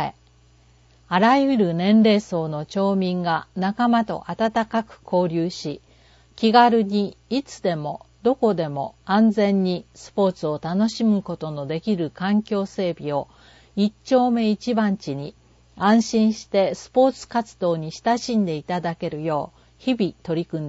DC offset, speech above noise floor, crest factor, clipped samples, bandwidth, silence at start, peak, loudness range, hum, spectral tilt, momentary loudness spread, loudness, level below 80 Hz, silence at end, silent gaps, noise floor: under 0.1%; 34 dB; 20 dB; under 0.1%; 8 kHz; 0 s; -2 dBFS; 4 LU; none; -6.5 dB/octave; 11 LU; -22 LUFS; -58 dBFS; 0 s; none; -55 dBFS